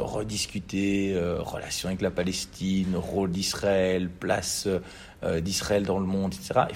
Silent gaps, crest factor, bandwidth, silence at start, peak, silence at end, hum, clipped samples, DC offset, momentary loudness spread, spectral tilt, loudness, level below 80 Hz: none; 20 dB; 16 kHz; 0 s; -8 dBFS; 0 s; none; under 0.1%; under 0.1%; 5 LU; -4.5 dB/octave; -28 LUFS; -50 dBFS